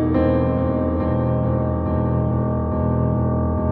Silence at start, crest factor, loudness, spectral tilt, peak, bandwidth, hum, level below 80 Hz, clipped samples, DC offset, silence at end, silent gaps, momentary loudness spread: 0 s; 14 dB; -20 LUFS; -13 dB/octave; -6 dBFS; 4.3 kHz; none; -30 dBFS; under 0.1%; under 0.1%; 0 s; none; 3 LU